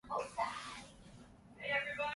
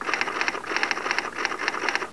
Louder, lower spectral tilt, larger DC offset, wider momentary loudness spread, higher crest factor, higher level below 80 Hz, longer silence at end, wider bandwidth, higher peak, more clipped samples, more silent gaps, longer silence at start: second, -40 LUFS vs -26 LUFS; first, -3 dB/octave vs -1 dB/octave; second, under 0.1% vs 0.4%; first, 22 LU vs 2 LU; about the same, 18 dB vs 22 dB; second, -68 dBFS vs -62 dBFS; about the same, 0 s vs 0 s; about the same, 11.5 kHz vs 11 kHz; second, -24 dBFS vs -6 dBFS; neither; neither; about the same, 0.05 s vs 0 s